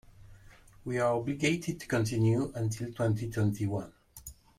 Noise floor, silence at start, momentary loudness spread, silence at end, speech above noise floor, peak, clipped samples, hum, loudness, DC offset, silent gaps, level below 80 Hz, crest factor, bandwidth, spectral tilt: -55 dBFS; 0.2 s; 18 LU; 0.25 s; 25 dB; -16 dBFS; under 0.1%; none; -31 LUFS; under 0.1%; none; -56 dBFS; 16 dB; 16 kHz; -6.5 dB/octave